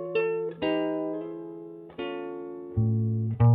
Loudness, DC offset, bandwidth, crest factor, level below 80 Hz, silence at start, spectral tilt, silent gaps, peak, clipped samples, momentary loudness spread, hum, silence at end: -30 LUFS; under 0.1%; 4.8 kHz; 16 dB; -52 dBFS; 0 s; -11.5 dB/octave; none; -10 dBFS; under 0.1%; 13 LU; none; 0 s